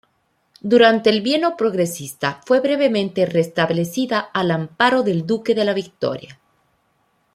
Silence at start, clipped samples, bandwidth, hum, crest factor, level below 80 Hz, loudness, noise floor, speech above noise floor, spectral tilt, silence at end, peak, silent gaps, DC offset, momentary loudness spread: 0.65 s; under 0.1%; 15.5 kHz; none; 18 dB; -64 dBFS; -18 LUFS; -66 dBFS; 48 dB; -5.5 dB/octave; 1 s; -2 dBFS; none; under 0.1%; 11 LU